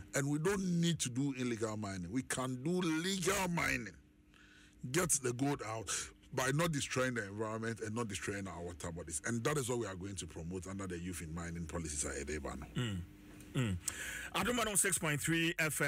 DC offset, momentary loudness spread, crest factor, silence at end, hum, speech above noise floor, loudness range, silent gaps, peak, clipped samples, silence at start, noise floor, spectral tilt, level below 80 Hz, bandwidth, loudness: under 0.1%; 11 LU; 18 dB; 0 s; none; 26 dB; 5 LU; none; -20 dBFS; under 0.1%; 0 s; -63 dBFS; -4 dB/octave; -58 dBFS; 16 kHz; -37 LUFS